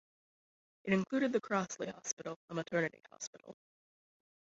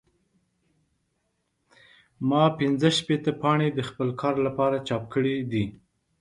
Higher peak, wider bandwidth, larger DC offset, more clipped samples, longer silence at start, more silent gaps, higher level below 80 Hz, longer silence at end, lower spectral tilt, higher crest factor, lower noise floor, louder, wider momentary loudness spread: second, -18 dBFS vs -6 dBFS; second, 7.6 kHz vs 11.5 kHz; neither; neither; second, 0.85 s vs 2.2 s; first, 2.13-2.17 s, 2.36-2.48 s, 3.27-3.33 s vs none; second, -78 dBFS vs -60 dBFS; first, 1 s vs 0.45 s; about the same, -5 dB/octave vs -6 dB/octave; about the same, 22 dB vs 20 dB; first, under -90 dBFS vs -75 dBFS; second, -37 LUFS vs -25 LUFS; first, 14 LU vs 7 LU